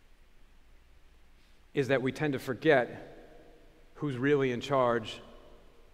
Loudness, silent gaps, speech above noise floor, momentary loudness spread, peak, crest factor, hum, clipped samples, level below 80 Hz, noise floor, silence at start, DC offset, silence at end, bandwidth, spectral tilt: -30 LUFS; none; 28 dB; 16 LU; -12 dBFS; 22 dB; none; under 0.1%; -58 dBFS; -58 dBFS; 1.75 s; under 0.1%; 0.45 s; 15.5 kHz; -6.5 dB/octave